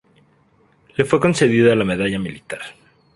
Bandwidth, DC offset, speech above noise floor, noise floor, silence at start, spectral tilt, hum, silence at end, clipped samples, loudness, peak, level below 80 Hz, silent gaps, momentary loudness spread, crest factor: 11.5 kHz; under 0.1%; 40 dB; -57 dBFS; 1 s; -6 dB/octave; none; 0.45 s; under 0.1%; -17 LUFS; 0 dBFS; -50 dBFS; none; 17 LU; 20 dB